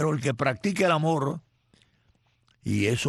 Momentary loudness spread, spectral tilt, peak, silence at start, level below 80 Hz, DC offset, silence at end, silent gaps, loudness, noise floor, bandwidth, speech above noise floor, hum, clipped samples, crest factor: 11 LU; -5.5 dB/octave; -10 dBFS; 0 s; -60 dBFS; under 0.1%; 0 s; none; -26 LUFS; -67 dBFS; 12.5 kHz; 42 dB; none; under 0.1%; 18 dB